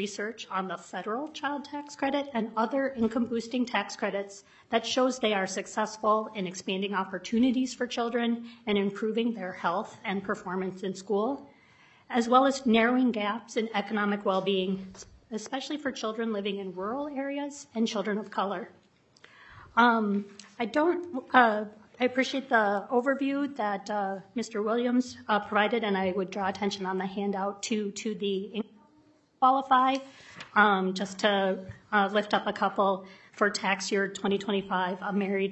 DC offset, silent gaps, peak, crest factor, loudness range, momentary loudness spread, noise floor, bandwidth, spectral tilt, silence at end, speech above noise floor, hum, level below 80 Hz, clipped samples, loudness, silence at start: under 0.1%; none; -6 dBFS; 22 dB; 6 LU; 11 LU; -63 dBFS; 8.4 kHz; -4.5 dB/octave; 0 s; 34 dB; none; -70 dBFS; under 0.1%; -29 LUFS; 0 s